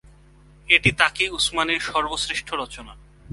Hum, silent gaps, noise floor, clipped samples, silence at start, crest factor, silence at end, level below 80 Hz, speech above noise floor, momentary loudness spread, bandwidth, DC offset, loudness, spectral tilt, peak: none; none; -51 dBFS; under 0.1%; 0.05 s; 24 dB; 0 s; -46 dBFS; 28 dB; 13 LU; 11.5 kHz; under 0.1%; -20 LUFS; -2.5 dB/octave; 0 dBFS